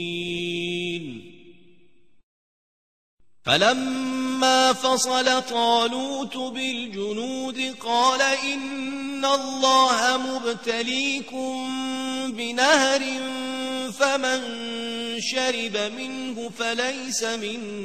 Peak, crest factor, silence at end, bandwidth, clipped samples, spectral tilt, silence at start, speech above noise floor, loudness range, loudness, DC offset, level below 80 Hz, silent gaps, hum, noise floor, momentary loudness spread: -2 dBFS; 22 dB; 0 s; 14 kHz; under 0.1%; -2 dB/octave; 0 s; 37 dB; 5 LU; -23 LUFS; 0.3%; -66 dBFS; 2.23-3.18 s; none; -61 dBFS; 11 LU